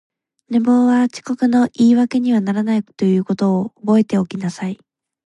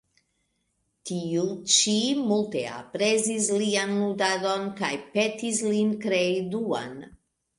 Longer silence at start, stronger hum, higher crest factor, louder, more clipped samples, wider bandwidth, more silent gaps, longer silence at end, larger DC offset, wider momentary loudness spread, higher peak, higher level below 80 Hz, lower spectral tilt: second, 0.5 s vs 1.05 s; neither; second, 14 dB vs 20 dB; first, -17 LUFS vs -25 LUFS; neither; about the same, 10.5 kHz vs 11.5 kHz; neither; about the same, 0.55 s vs 0.45 s; neither; about the same, 10 LU vs 11 LU; about the same, -4 dBFS vs -6 dBFS; about the same, -64 dBFS vs -68 dBFS; first, -7.5 dB/octave vs -3 dB/octave